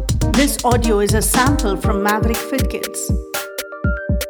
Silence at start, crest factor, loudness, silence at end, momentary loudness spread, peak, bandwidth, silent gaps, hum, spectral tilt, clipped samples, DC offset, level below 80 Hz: 0 s; 16 dB; -18 LUFS; 0 s; 8 LU; -2 dBFS; over 20 kHz; none; none; -4.5 dB/octave; under 0.1%; under 0.1%; -24 dBFS